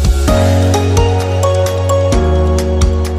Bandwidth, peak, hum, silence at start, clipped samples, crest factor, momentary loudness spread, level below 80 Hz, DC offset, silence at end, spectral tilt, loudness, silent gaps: 15 kHz; 0 dBFS; none; 0 s; under 0.1%; 10 dB; 2 LU; -16 dBFS; under 0.1%; 0 s; -6 dB/octave; -12 LUFS; none